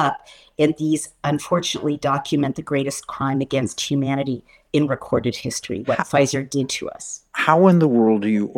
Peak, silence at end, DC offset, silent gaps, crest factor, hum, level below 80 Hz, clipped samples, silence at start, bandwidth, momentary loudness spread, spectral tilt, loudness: 0 dBFS; 0.05 s; under 0.1%; none; 20 dB; none; -56 dBFS; under 0.1%; 0 s; 16.5 kHz; 11 LU; -5.5 dB/octave; -21 LUFS